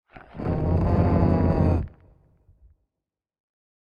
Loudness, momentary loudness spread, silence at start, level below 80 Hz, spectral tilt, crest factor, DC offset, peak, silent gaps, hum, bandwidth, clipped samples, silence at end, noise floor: -23 LUFS; 14 LU; 0.15 s; -36 dBFS; -11 dB/octave; 18 dB; under 0.1%; -8 dBFS; none; none; 5.2 kHz; under 0.1%; 2.05 s; -87 dBFS